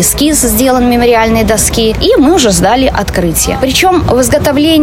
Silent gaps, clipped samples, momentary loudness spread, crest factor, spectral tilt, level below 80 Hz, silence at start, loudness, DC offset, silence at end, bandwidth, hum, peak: none; under 0.1%; 3 LU; 8 dB; -4 dB/octave; -22 dBFS; 0 s; -8 LUFS; under 0.1%; 0 s; 17 kHz; none; 0 dBFS